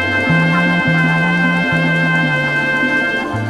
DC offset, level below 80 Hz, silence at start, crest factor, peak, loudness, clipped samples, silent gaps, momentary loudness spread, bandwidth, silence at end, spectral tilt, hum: under 0.1%; -46 dBFS; 0 s; 12 dB; -2 dBFS; -14 LUFS; under 0.1%; none; 2 LU; 11.5 kHz; 0 s; -6.5 dB/octave; none